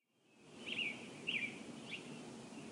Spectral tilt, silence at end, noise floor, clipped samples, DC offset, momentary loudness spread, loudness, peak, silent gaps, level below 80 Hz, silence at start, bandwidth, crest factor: -3 dB/octave; 0 s; -67 dBFS; under 0.1%; under 0.1%; 12 LU; -44 LUFS; -28 dBFS; none; -84 dBFS; 0.3 s; 14.5 kHz; 18 dB